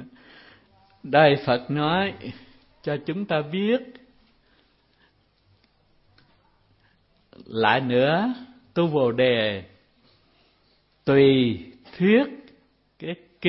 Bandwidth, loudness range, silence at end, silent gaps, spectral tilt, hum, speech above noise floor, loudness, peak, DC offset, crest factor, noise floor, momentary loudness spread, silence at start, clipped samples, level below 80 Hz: 5.8 kHz; 7 LU; 0 s; none; -10.5 dB/octave; none; 43 dB; -22 LUFS; -4 dBFS; under 0.1%; 22 dB; -64 dBFS; 17 LU; 0 s; under 0.1%; -62 dBFS